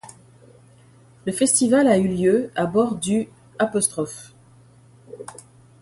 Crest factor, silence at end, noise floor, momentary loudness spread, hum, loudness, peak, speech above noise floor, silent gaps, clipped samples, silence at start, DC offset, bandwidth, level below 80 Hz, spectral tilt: 18 dB; 0.5 s; -51 dBFS; 22 LU; none; -20 LUFS; -4 dBFS; 31 dB; none; under 0.1%; 0.05 s; under 0.1%; 12 kHz; -58 dBFS; -4.5 dB/octave